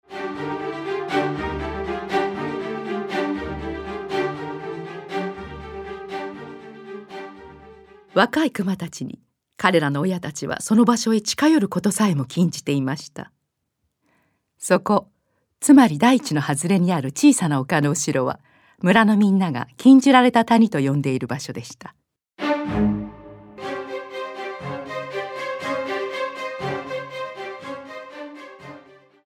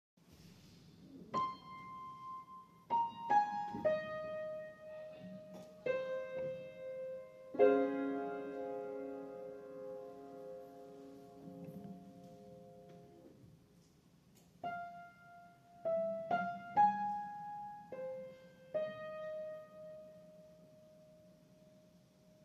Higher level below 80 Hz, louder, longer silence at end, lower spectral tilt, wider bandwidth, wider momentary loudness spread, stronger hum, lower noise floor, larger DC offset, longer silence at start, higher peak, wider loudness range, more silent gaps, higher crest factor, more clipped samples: first, -50 dBFS vs -80 dBFS; first, -21 LUFS vs -40 LUFS; first, 0.45 s vs 0 s; second, -5 dB/octave vs -6.5 dB/octave; first, 16.5 kHz vs 14 kHz; second, 19 LU vs 25 LU; neither; first, -75 dBFS vs -67 dBFS; neither; second, 0.1 s vs 0.3 s; first, 0 dBFS vs -16 dBFS; second, 12 LU vs 15 LU; neither; about the same, 22 dB vs 26 dB; neither